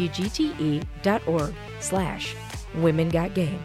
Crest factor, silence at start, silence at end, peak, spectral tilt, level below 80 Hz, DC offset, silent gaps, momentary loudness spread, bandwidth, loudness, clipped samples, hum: 16 dB; 0 s; 0 s; -10 dBFS; -5.5 dB/octave; -42 dBFS; under 0.1%; none; 9 LU; 14.5 kHz; -26 LUFS; under 0.1%; none